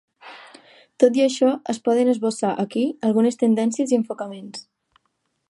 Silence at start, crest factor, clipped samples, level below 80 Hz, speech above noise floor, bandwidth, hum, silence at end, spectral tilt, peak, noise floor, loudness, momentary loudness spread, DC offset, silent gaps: 0.25 s; 20 dB; under 0.1%; -76 dBFS; 52 dB; 11.5 kHz; none; 0.85 s; -5.5 dB/octave; -2 dBFS; -72 dBFS; -21 LUFS; 17 LU; under 0.1%; none